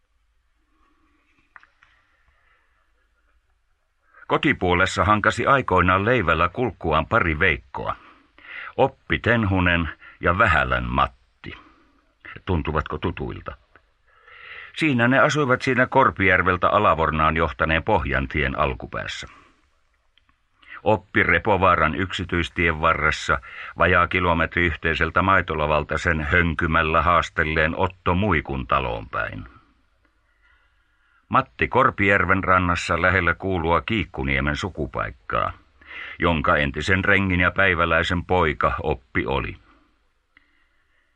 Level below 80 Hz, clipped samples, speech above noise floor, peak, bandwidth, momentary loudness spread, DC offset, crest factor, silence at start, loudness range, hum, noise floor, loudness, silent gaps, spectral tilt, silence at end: -38 dBFS; under 0.1%; 46 dB; -4 dBFS; 9.8 kHz; 12 LU; under 0.1%; 20 dB; 4.3 s; 7 LU; none; -67 dBFS; -21 LUFS; none; -6 dB/octave; 1.6 s